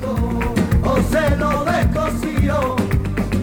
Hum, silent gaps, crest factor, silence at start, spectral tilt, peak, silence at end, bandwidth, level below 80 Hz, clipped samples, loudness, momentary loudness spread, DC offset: none; none; 12 dB; 0 s; -7 dB/octave; -6 dBFS; 0 s; 19.5 kHz; -24 dBFS; under 0.1%; -19 LUFS; 4 LU; under 0.1%